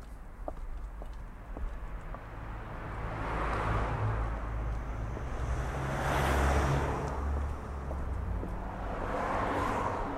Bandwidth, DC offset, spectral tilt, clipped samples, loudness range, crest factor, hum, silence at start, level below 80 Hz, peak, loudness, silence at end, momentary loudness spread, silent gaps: 14 kHz; under 0.1%; -6.5 dB/octave; under 0.1%; 6 LU; 16 dB; none; 0 s; -38 dBFS; -16 dBFS; -35 LUFS; 0 s; 15 LU; none